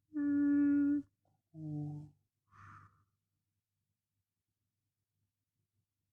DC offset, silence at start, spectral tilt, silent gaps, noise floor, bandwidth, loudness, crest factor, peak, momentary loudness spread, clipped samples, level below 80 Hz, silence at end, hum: under 0.1%; 0.15 s; -10.5 dB/octave; none; -90 dBFS; 2.7 kHz; -34 LUFS; 14 dB; -26 dBFS; 17 LU; under 0.1%; -78 dBFS; 3.35 s; none